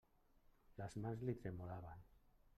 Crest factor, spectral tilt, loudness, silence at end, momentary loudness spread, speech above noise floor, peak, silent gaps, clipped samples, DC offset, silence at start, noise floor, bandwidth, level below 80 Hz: 18 dB; -8 dB/octave; -50 LUFS; 0.05 s; 15 LU; 25 dB; -32 dBFS; none; under 0.1%; under 0.1%; 0.7 s; -73 dBFS; 13 kHz; -68 dBFS